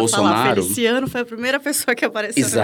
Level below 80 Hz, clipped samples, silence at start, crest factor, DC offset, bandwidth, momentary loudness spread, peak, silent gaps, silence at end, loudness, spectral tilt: -58 dBFS; under 0.1%; 0 s; 16 dB; under 0.1%; 19 kHz; 6 LU; -2 dBFS; none; 0 s; -19 LUFS; -3.5 dB/octave